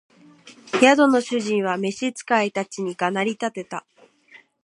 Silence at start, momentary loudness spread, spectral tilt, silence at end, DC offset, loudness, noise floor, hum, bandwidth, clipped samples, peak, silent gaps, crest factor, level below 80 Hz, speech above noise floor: 0.45 s; 13 LU; -4.5 dB/octave; 0.25 s; under 0.1%; -21 LUFS; -52 dBFS; none; 11.5 kHz; under 0.1%; -2 dBFS; none; 22 dB; -76 dBFS; 31 dB